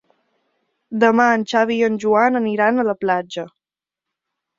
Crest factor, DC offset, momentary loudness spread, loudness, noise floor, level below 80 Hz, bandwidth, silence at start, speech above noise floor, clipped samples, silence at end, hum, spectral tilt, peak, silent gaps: 18 dB; under 0.1%; 14 LU; -17 LUFS; -88 dBFS; -66 dBFS; 7.6 kHz; 0.9 s; 71 dB; under 0.1%; 1.1 s; none; -5.5 dB/octave; -2 dBFS; none